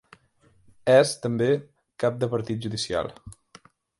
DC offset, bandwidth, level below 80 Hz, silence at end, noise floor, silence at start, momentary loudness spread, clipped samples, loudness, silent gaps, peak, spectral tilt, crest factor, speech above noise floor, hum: under 0.1%; 11.5 kHz; -58 dBFS; 0.65 s; -61 dBFS; 0.85 s; 11 LU; under 0.1%; -24 LUFS; none; -6 dBFS; -5 dB/octave; 20 dB; 38 dB; none